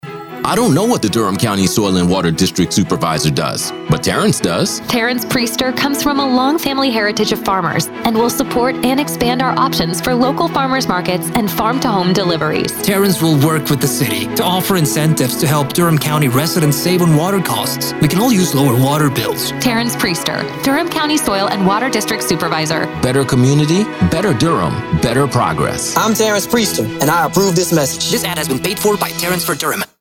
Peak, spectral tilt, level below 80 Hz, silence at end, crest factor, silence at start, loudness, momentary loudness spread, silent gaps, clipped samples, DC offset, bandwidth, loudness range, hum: -2 dBFS; -4.5 dB/octave; -42 dBFS; 0.15 s; 12 dB; 0.05 s; -14 LUFS; 4 LU; none; under 0.1%; under 0.1%; 17.5 kHz; 2 LU; none